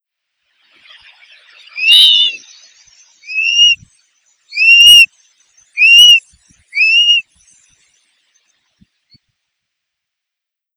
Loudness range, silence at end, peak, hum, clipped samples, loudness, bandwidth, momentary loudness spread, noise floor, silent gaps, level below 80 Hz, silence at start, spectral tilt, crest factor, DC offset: 9 LU; 3.55 s; 0 dBFS; none; 1%; -6 LUFS; over 20 kHz; 19 LU; -82 dBFS; none; -56 dBFS; 1.75 s; 4.5 dB/octave; 14 dB; under 0.1%